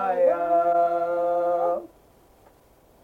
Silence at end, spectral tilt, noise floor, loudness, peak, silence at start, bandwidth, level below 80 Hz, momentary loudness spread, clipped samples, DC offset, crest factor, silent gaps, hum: 1.15 s; -7 dB/octave; -57 dBFS; -23 LUFS; -10 dBFS; 0 s; 4.4 kHz; -64 dBFS; 5 LU; under 0.1%; under 0.1%; 14 dB; none; none